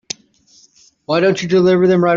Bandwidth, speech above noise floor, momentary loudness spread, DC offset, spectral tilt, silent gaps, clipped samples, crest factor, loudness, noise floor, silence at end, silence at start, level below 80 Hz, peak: 7.6 kHz; 39 dB; 17 LU; under 0.1%; -5.5 dB/octave; none; under 0.1%; 14 dB; -14 LUFS; -51 dBFS; 0 s; 1.1 s; -56 dBFS; -2 dBFS